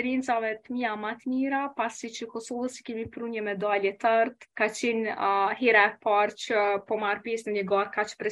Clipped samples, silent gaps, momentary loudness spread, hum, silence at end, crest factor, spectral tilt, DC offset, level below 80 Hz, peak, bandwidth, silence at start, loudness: under 0.1%; none; 11 LU; none; 0 s; 20 dB; -4 dB/octave; under 0.1%; -70 dBFS; -6 dBFS; 12 kHz; 0 s; -27 LUFS